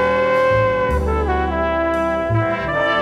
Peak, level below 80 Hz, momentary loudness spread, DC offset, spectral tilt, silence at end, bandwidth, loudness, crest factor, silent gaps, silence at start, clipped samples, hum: -4 dBFS; -28 dBFS; 4 LU; under 0.1%; -7 dB/octave; 0 s; 12 kHz; -18 LUFS; 12 dB; none; 0 s; under 0.1%; none